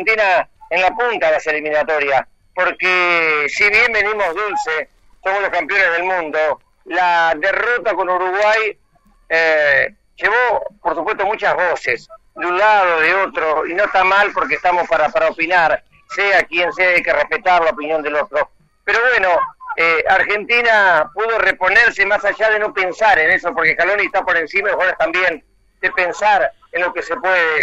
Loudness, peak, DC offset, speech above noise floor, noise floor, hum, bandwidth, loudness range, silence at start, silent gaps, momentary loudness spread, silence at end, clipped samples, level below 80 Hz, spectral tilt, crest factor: -15 LUFS; 0 dBFS; under 0.1%; 38 dB; -54 dBFS; none; 9.8 kHz; 3 LU; 0 s; none; 8 LU; 0 s; under 0.1%; -50 dBFS; -3 dB/octave; 16 dB